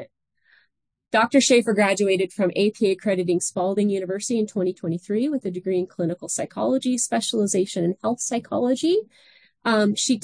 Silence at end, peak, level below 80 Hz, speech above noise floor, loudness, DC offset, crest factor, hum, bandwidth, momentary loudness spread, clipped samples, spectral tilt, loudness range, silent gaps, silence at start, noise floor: 0.05 s; -6 dBFS; -70 dBFS; 47 dB; -22 LUFS; under 0.1%; 18 dB; none; 10.5 kHz; 8 LU; under 0.1%; -4 dB/octave; 4 LU; none; 0 s; -69 dBFS